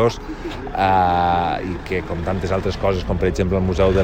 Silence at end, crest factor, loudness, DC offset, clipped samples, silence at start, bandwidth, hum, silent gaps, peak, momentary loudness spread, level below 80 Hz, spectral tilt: 0 s; 16 dB; -20 LUFS; under 0.1%; under 0.1%; 0 s; 16 kHz; none; none; -4 dBFS; 10 LU; -32 dBFS; -7 dB/octave